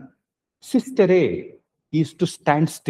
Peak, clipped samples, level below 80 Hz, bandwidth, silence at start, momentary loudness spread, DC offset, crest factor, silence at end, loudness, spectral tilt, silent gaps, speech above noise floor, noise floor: -2 dBFS; under 0.1%; -64 dBFS; 14 kHz; 0 s; 8 LU; under 0.1%; 20 dB; 0 s; -21 LUFS; -6.5 dB/octave; none; 54 dB; -74 dBFS